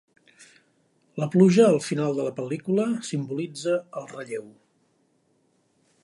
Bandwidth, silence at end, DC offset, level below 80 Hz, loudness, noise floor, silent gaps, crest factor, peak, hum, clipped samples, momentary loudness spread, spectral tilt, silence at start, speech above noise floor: 11.5 kHz; 1.55 s; under 0.1%; -74 dBFS; -24 LUFS; -67 dBFS; none; 20 dB; -6 dBFS; none; under 0.1%; 18 LU; -6.5 dB/octave; 1.15 s; 44 dB